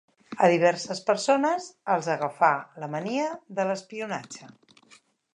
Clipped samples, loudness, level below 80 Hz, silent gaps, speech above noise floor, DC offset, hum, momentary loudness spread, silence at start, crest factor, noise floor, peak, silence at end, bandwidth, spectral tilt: under 0.1%; -26 LUFS; -80 dBFS; none; 33 dB; under 0.1%; none; 12 LU; 0.3 s; 20 dB; -59 dBFS; -6 dBFS; 0.9 s; 11 kHz; -4.5 dB/octave